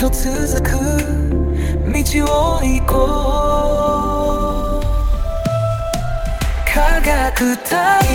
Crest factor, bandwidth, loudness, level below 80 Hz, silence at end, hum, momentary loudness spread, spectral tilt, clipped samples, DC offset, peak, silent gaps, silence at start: 14 dB; 18 kHz; -17 LUFS; -18 dBFS; 0 s; none; 5 LU; -5 dB/octave; under 0.1%; 0.3%; -2 dBFS; none; 0 s